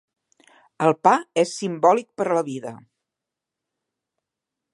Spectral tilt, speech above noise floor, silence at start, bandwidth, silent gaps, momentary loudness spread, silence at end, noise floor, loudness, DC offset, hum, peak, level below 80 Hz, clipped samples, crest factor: -5 dB/octave; 65 dB; 0.8 s; 11.5 kHz; none; 12 LU; 1.95 s; -86 dBFS; -21 LUFS; under 0.1%; none; -2 dBFS; -76 dBFS; under 0.1%; 22 dB